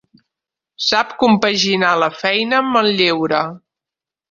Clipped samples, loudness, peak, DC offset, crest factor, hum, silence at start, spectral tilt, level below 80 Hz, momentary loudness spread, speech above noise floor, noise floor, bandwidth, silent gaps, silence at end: under 0.1%; -15 LUFS; 0 dBFS; under 0.1%; 18 dB; none; 0.8 s; -4 dB/octave; -58 dBFS; 5 LU; 72 dB; -88 dBFS; 7.6 kHz; none; 0.75 s